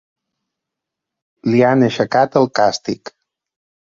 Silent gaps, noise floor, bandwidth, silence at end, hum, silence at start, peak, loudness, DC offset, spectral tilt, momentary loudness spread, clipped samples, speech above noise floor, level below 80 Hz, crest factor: none; -82 dBFS; 7.6 kHz; 0.9 s; none; 1.45 s; 0 dBFS; -16 LUFS; under 0.1%; -6 dB/octave; 12 LU; under 0.1%; 67 dB; -58 dBFS; 18 dB